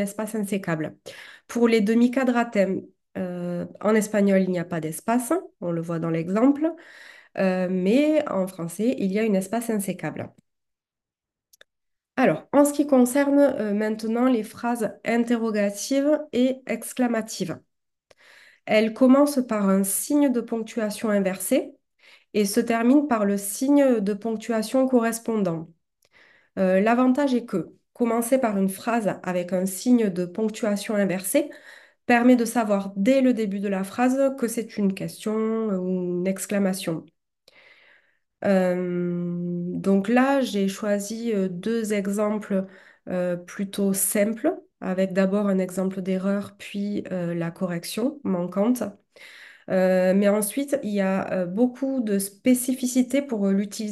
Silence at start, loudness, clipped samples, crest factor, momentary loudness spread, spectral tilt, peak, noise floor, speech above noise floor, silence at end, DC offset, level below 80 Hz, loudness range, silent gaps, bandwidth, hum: 0 s; -24 LUFS; under 0.1%; 18 dB; 10 LU; -5.5 dB/octave; -6 dBFS; -90 dBFS; 67 dB; 0 s; under 0.1%; -70 dBFS; 5 LU; none; 12.5 kHz; none